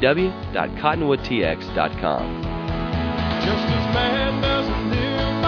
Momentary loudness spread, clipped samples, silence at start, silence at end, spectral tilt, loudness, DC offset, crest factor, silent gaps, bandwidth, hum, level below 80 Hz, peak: 6 LU; under 0.1%; 0 s; 0 s; -7 dB/octave; -22 LUFS; under 0.1%; 20 dB; none; 5.4 kHz; none; -34 dBFS; -2 dBFS